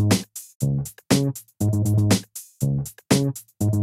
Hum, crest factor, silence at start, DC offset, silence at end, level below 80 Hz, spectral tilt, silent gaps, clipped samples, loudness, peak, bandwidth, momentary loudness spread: none; 18 dB; 0 s; under 0.1%; 0 s; -48 dBFS; -5.5 dB/octave; 0.55-0.60 s; under 0.1%; -23 LUFS; -4 dBFS; 16 kHz; 8 LU